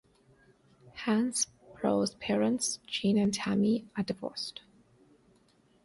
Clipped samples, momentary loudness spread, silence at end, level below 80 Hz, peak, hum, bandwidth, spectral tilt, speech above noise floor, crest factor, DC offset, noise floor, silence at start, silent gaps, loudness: under 0.1%; 10 LU; 1.25 s; -66 dBFS; -16 dBFS; none; 11.5 kHz; -4 dB/octave; 36 dB; 16 dB; under 0.1%; -66 dBFS; 0.95 s; none; -31 LUFS